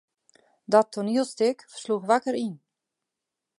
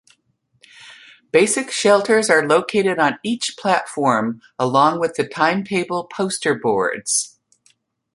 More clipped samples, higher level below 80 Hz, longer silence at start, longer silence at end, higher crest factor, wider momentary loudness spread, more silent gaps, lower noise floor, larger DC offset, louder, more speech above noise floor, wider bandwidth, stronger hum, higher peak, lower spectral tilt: neither; second, -78 dBFS vs -64 dBFS; about the same, 0.7 s vs 0.8 s; about the same, 1 s vs 0.9 s; about the same, 22 dB vs 18 dB; about the same, 9 LU vs 8 LU; neither; first, -86 dBFS vs -64 dBFS; neither; second, -25 LUFS vs -18 LUFS; first, 62 dB vs 46 dB; about the same, 11.5 kHz vs 11.5 kHz; neither; second, -6 dBFS vs -2 dBFS; first, -5 dB/octave vs -3.5 dB/octave